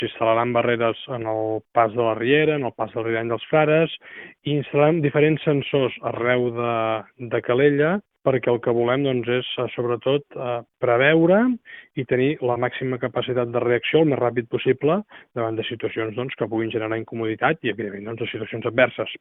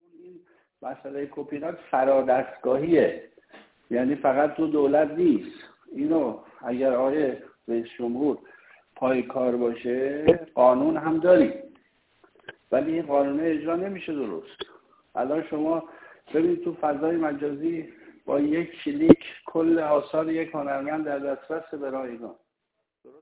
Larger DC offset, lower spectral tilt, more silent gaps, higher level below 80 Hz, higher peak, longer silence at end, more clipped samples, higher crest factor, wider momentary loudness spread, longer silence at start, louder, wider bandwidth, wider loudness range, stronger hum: neither; about the same, -10.5 dB/octave vs -10.5 dB/octave; neither; about the same, -62 dBFS vs -58 dBFS; about the same, -2 dBFS vs 0 dBFS; second, 0.05 s vs 0.9 s; neither; about the same, 20 dB vs 24 dB; second, 10 LU vs 16 LU; second, 0 s vs 0.25 s; first, -22 LUFS vs -25 LUFS; about the same, 4 kHz vs 4 kHz; about the same, 4 LU vs 5 LU; neither